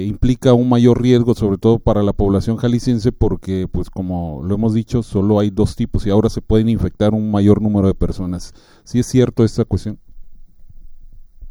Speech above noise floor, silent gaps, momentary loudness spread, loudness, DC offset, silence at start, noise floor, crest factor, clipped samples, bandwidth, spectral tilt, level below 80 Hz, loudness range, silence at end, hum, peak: 21 dB; none; 10 LU; -16 LUFS; under 0.1%; 0 s; -36 dBFS; 16 dB; under 0.1%; 12 kHz; -8 dB/octave; -30 dBFS; 4 LU; 0 s; none; 0 dBFS